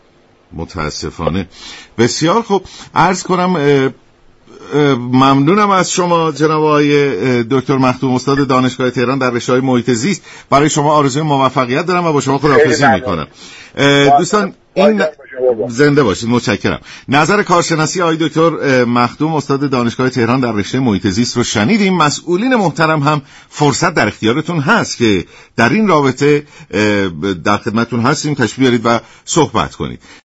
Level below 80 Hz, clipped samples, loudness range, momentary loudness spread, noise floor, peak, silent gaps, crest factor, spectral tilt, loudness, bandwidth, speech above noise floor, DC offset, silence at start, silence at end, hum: -44 dBFS; under 0.1%; 2 LU; 9 LU; -49 dBFS; 0 dBFS; none; 12 dB; -5 dB/octave; -13 LUFS; 8.2 kHz; 36 dB; under 0.1%; 0.5 s; 0.15 s; none